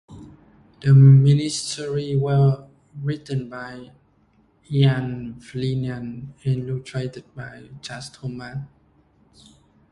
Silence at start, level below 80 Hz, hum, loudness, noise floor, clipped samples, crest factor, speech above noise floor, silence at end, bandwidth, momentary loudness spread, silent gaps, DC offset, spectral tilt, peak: 0.1 s; -54 dBFS; none; -20 LUFS; -60 dBFS; under 0.1%; 18 dB; 40 dB; 1.25 s; 11 kHz; 22 LU; none; under 0.1%; -7 dB/octave; -4 dBFS